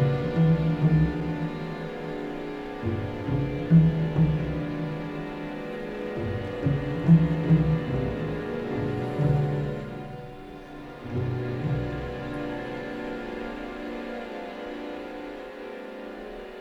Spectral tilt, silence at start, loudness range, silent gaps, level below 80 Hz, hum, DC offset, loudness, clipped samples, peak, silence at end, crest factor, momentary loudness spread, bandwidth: -9 dB/octave; 0 s; 10 LU; none; -44 dBFS; none; under 0.1%; -27 LUFS; under 0.1%; -8 dBFS; 0 s; 20 dB; 16 LU; 5.6 kHz